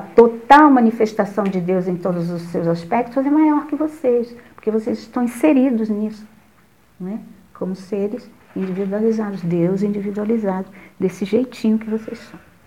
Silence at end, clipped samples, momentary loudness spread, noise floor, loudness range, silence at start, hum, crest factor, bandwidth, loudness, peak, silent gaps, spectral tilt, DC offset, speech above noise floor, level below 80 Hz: 0.3 s; under 0.1%; 16 LU; -54 dBFS; 8 LU; 0 s; none; 18 dB; 15 kHz; -18 LUFS; 0 dBFS; none; -7.5 dB/octave; 0.2%; 36 dB; -58 dBFS